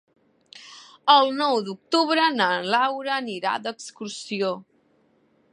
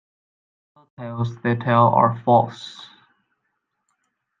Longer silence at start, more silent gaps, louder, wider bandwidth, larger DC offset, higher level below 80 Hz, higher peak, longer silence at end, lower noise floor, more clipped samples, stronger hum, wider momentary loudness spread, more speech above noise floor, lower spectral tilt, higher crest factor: second, 0.55 s vs 1 s; neither; second, -22 LUFS vs -19 LUFS; first, 11.5 kHz vs 7.4 kHz; neither; second, -80 dBFS vs -68 dBFS; about the same, -2 dBFS vs -2 dBFS; second, 0.9 s vs 1.55 s; second, -63 dBFS vs -75 dBFS; neither; neither; second, 18 LU vs 21 LU; second, 41 dB vs 56 dB; second, -3.5 dB/octave vs -8 dB/octave; about the same, 22 dB vs 20 dB